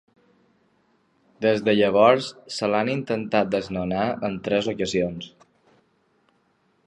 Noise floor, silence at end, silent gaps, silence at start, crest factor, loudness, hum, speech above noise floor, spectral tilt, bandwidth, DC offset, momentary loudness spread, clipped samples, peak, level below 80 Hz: -66 dBFS; 1.6 s; none; 1.4 s; 22 dB; -23 LUFS; none; 44 dB; -5.5 dB/octave; 11 kHz; under 0.1%; 11 LU; under 0.1%; -2 dBFS; -58 dBFS